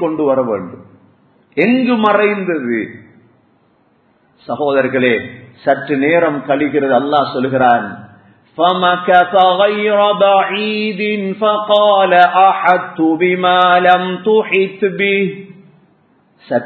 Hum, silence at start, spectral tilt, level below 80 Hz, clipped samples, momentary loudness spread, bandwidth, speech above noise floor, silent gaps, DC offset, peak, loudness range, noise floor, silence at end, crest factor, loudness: none; 0 s; -8 dB/octave; -60 dBFS; under 0.1%; 10 LU; 4.5 kHz; 42 dB; none; under 0.1%; 0 dBFS; 6 LU; -55 dBFS; 0 s; 14 dB; -13 LUFS